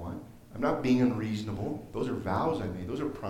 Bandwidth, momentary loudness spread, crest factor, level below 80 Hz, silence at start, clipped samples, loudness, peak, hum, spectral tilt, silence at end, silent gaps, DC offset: 15.5 kHz; 11 LU; 16 dB; -54 dBFS; 0 s; under 0.1%; -31 LUFS; -16 dBFS; none; -7.5 dB/octave; 0 s; none; under 0.1%